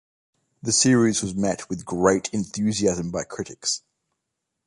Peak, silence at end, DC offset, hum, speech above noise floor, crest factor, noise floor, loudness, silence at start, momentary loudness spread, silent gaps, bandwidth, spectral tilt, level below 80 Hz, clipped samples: -4 dBFS; 0.9 s; under 0.1%; none; 58 dB; 20 dB; -81 dBFS; -23 LUFS; 0.65 s; 12 LU; none; 11.5 kHz; -4 dB/octave; -54 dBFS; under 0.1%